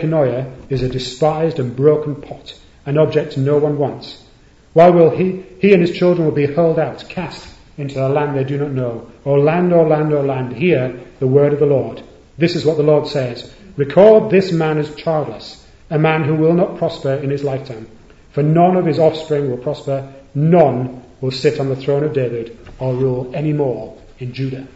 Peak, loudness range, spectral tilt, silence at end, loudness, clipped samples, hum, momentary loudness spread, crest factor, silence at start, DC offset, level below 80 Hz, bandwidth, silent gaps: 0 dBFS; 4 LU; -8 dB/octave; 0.1 s; -16 LUFS; under 0.1%; none; 15 LU; 16 dB; 0 s; under 0.1%; -46 dBFS; 8 kHz; none